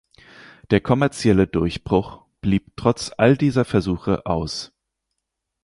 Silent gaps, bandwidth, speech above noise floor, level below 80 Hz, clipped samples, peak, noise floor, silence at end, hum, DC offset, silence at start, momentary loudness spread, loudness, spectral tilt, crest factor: none; 11.5 kHz; 60 dB; -42 dBFS; under 0.1%; -2 dBFS; -80 dBFS; 1 s; none; under 0.1%; 0.7 s; 10 LU; -21 LUFS; -6.5 dB/octave; 20 dB